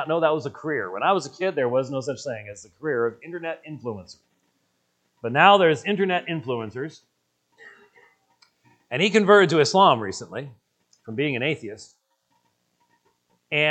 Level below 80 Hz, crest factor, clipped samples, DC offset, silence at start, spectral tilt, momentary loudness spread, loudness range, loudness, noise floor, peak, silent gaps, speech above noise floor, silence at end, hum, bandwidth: -72 dBFS; 24 dB; under 0.1%; under 0.1%; 0 s; -5 dB/octave; 19 LU; 10 LU; -22 LUFS; -71 dBFS; 0 dBFS; none; 49 dB; 0 s; none; 9 kHz